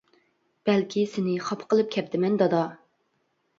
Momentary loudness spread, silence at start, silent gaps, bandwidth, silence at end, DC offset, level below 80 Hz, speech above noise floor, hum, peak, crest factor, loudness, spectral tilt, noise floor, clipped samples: 6 LU; 0.65 s; none; 7.6 kHz; 0.85 s; under 0.1%; -74 dBFS; 48 dB; none; -10 dBFS; 18 dB; -26 LUFS; -6.5 dB/octave; -72 dBFS; under 0.1%